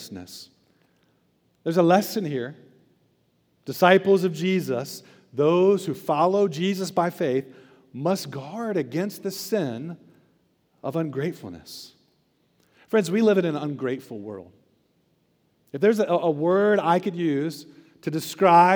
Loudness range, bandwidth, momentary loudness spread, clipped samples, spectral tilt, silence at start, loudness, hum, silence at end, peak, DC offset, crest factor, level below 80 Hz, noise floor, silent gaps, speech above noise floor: 8 LU; over 20 kHz; 20 LU; under 0.1%; -6 dB/octave; 0 s; -23 LUFS; none; 0 s; -2 dBFS; under 0.1%; 22 dB; -78 dBFS; -67 dBFS; none; 44 dB